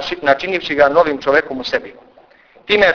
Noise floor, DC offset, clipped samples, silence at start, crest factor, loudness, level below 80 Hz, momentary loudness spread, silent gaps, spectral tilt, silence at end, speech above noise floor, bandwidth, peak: -48 dBFS; under 0.1%; under 0.1%; 0 s; 16 dB; -15 LUFS; -48 dBFS; 9 LU; none; -4.5 dB/octave; 0 s; 32 dB; 5.4 kHz; 0 dBFS